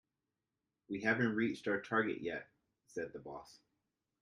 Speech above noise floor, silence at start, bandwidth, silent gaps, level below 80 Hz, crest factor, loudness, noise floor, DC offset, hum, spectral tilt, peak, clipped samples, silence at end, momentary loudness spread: 52 dB; 0.9 s; 11 kHz; none; -76 dBFS; 20 dB; -37 LUFS; -90 dBFS; under 0.1%; none; -6.5 dB/octave; -20 dBFS; under 0.1%; 0.65 s; 16 LU